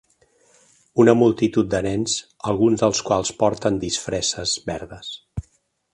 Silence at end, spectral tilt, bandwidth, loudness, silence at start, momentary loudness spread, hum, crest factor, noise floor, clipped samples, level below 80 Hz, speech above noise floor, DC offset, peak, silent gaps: 0.55 s; -4.5 dB/octave; 11.5 kHz; -20 LUFS; 0.95 s; 16 LU; none; 20 dB; -63 dBFS; under 0.1%; -48 dBFS; 43 dB; under 0.1%; -2 dBFS; none